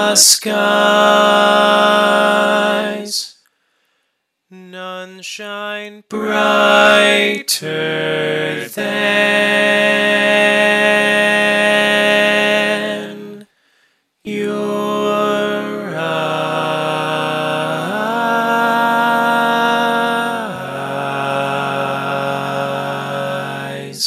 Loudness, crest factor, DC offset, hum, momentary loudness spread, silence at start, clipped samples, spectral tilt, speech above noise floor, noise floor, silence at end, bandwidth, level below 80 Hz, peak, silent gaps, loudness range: -14 LUFS; 16 dB; under 0.1%; none; 14 LU; 0 s; under 0.1%; -2.5 dB/octave; 57 dB; -70 dBFS; 0 s; 15.5 kHz; -68 dBFS; 0 dBFS; none; 8 LU